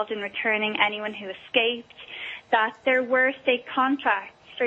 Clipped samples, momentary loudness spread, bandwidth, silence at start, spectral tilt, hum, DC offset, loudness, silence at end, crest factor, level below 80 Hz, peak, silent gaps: under 0.1%; 13 LU; 7.4 kHz; 0 s; -5 dB/octave; none; under 0.1%; -24 LUFS; 0 s; 20 dB; -72 dBFS; -6 dBFS; none